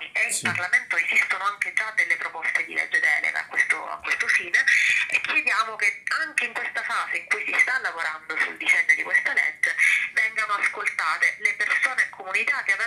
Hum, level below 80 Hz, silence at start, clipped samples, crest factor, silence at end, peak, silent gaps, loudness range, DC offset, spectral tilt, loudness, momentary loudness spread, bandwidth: none; -74 dBFS; 0 s; under 0.1%; 18 dB; 0 s; -6 dBFS; none; 2 LU; under 0.1%; 0 dB/octave; -22 LUFS; 7 LU; 15.5 kHz